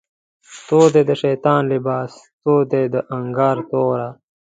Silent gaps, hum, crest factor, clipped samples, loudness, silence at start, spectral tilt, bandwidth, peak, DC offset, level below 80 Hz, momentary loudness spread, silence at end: 2.33-2.39 s; none; 18 dB; under 0.1%; -18 LUFS; 0.5 s; -7 dB/octave; 9.2 kHz; 0 dBFS; under 0.1%; -62 dBFS; 11 LU; 0.4 s